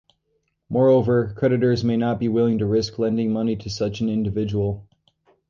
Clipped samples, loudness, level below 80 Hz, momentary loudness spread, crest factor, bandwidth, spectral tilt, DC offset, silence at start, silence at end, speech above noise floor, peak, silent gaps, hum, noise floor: under 0.1%; -21 LUFS; -48 dBFS; 8 LU; 14 dB; 7.2 kHz; -7.5 dB/octave; under 0.1%; 0.7 s; 0.7 s; 51 dB; -8 dBFS; none; none; -71 dBFS